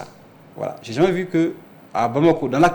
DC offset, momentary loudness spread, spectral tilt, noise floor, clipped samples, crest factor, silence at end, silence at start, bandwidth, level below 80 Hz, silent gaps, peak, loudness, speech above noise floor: under 0.1%; 13 LU; -7 dB/octave; -45 dBFS; under 0.1%; 14 dB; 0 s; 0 s; 19 kHz; -52 dBFS; none; -6 dBFS; -21 LUFS; 27 dB